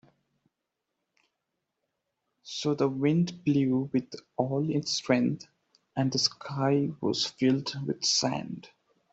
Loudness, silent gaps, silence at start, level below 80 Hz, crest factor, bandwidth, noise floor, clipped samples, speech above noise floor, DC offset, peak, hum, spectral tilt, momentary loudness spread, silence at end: -28 LUFS; none; 2.45 s; -68 dBFS; 20 dB; 8.2 kHz; -85 dBFS; under 0.1%; 57 dB; under 0.1%; -10 dBFS; none; -5 dB/octave; 10 LU; 0.45 s